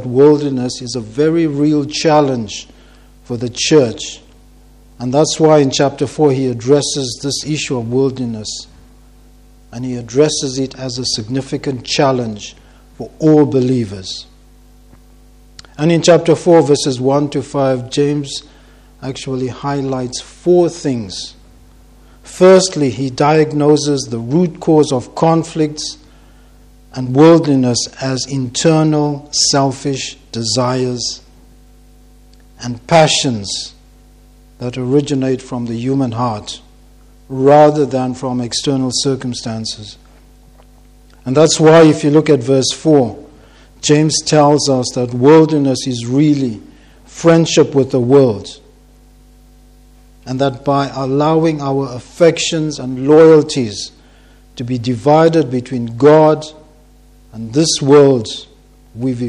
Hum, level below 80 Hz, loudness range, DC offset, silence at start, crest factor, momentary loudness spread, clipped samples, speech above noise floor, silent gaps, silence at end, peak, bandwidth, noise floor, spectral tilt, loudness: 50 Hz at -40 dBFS; -46 dBFS; 7 LU; under 0.1%; 0 s; 14 dB; 16 LU; 0.1%; 31 dB; none; 0 s; 0 dBFS; 11.5 kHz; -44 dBFS; -5 dB/octave; -13 LUFS